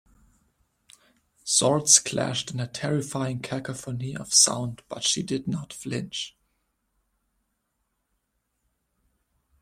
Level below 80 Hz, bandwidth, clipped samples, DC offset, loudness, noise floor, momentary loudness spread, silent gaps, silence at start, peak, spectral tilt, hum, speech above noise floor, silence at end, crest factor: -64 dBFS; 16.5 kHz; under 0.1%; under 0.1%; -24 LUFS; -77 dBFS; 16 LU; none; 1.45 s; 0 dBFS; -2.5 dB/octave; none; 51 dB; 3.3 s; 28 dB